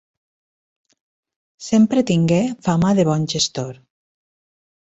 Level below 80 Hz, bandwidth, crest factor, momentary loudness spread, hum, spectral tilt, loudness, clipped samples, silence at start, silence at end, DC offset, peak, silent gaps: -52 dBFS; 8.2 kHz; 16 dB; 11 LU; none; -5.5 dB/octave; -18 LUFS; under 0.1%; 1.6 s; 1.15 s; under 0.1%; -4 dBFS; none